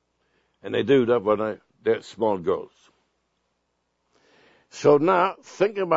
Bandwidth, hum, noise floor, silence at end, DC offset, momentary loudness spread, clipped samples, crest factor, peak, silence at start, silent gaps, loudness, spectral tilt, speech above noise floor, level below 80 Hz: 8 kHz; none; -74 dBFS; 0 s; under 0.1%; 11 LU; under 0.1%; 20 dB; -4 dBFS; 0.65 s; none; -23 LUFS; -6.5 dB/octave; 52 dB; -68 dBFS